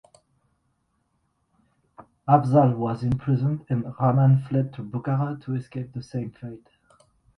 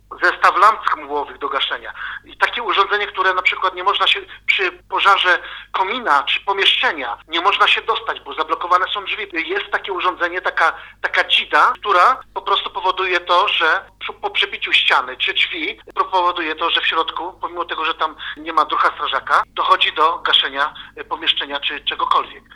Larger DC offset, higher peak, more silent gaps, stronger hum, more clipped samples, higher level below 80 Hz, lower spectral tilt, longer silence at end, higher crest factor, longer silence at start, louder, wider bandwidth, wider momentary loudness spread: neither; second, -4 dBFS vs 0 dBFS; neither; neither; neither; about the same, -56 dBFS vs -54 dBFS; first, -10.5 dB/octave vs -1.5 dB/octave; first, 0.8 s vs 0.15 s; about the same, 20 dB vs 18 dB; first, 2 s vs 0.1 s; second, -24 LUFS vs -17 LUFS; second, 6.2 kHz vs 13 kHz; first, 15 LU vs 10 LU